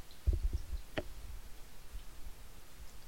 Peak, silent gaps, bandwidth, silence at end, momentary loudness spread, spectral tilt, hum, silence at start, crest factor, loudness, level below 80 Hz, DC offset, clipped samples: -20 dBFS; none; 16.5 kHz; 0 s; 18 LU; -5.5 dB/octave; none; 0 s; 20 dB; -44 LUFS; -42 dBFS; 0.4%; under 0.1%